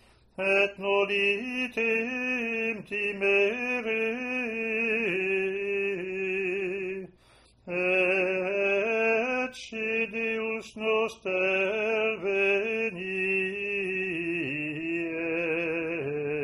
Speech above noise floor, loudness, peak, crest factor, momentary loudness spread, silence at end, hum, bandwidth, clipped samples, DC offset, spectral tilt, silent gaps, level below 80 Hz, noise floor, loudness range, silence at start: 32 dB; -27 LUFS; -12 dBFS; 16 dB; 7 LU; 0 s; none; 11 kHz; under 0.1%; under 0.1%; -5 dB/octave; none; -66 dBFS; -59 dBFS; 2 LU; 0.4 s